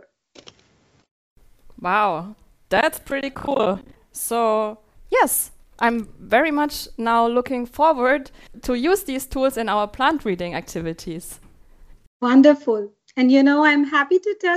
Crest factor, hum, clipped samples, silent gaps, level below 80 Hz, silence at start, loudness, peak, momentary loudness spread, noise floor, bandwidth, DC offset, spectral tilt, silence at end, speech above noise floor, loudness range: 18 dB; none; under 0.1%; 12.07-12.20 s; -48 dBFS; 1.8 s; -20 LUFS; -4 dBFS; 15 LU; -59 dBFS; 15.5 kHz; under 0.1%; -4 dB/octave; 0 s; 40 dB; 6 LU